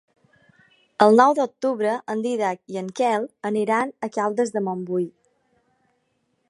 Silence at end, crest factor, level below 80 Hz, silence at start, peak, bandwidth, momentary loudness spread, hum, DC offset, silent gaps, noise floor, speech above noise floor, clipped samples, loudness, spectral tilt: 1.4 s; 22 dB; -76 dBFS; 1 s; 0 dBFS; 11.5 kHz; 11 LU; none; under 0.1%; none; -70 dBFS; 49 dB; under 0.1%; -22 LUFS; -5.5 dB/octave